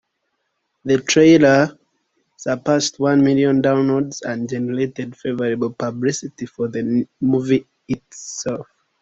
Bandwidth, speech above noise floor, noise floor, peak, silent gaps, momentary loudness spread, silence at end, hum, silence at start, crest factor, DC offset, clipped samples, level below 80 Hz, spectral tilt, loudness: 8 kHz; 55 dB; -72 dBFS; -2 dBFS; none; 15 LU; 0.4 s; none; 0.85 s; 18 dB; under 0.1%; under 0.1%; -56 dBFS; -5 dB/octave; -18 LUFS